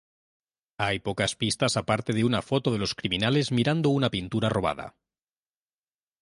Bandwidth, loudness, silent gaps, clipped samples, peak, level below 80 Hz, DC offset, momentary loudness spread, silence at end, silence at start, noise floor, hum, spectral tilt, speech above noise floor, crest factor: 11.5 kHz; -26 LUFS; none; under 0.1%; -8 dBFS; -54 dBFS; under 0.1%; 5 LU; 1.3 s; 0.8 s; under -90 dBFS; none; -5 dB/octave; over 64 dB; 20 dB